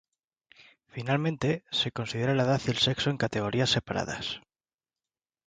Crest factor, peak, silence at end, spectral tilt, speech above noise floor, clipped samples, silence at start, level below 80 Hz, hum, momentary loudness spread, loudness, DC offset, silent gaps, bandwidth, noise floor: 20 dB; -10 dBFS; 1.1 s; -5 dB/octave; over 62 dB; under 0.1%; 0.6 s; -58 dBFS; none; 9 LU; -28 LUFS; under 0.1%; none; 9.4 kHz; under -90 dBFS